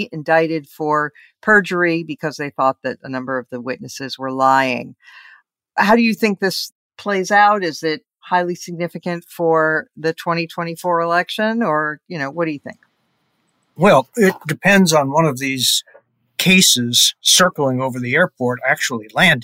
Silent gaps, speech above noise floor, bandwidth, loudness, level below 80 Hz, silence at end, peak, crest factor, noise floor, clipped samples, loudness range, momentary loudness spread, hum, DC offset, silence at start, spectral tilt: 6.72-6.90 s; 49 dB; 16 kHz; -17 LUFS; -60 dBFS; 0 s; 0 dBFS; 16 dB; -66 dBFS; under 0.1%; 7 LU; 14 LU; none; under 0.1%; 0 s; -3.5 dB/octave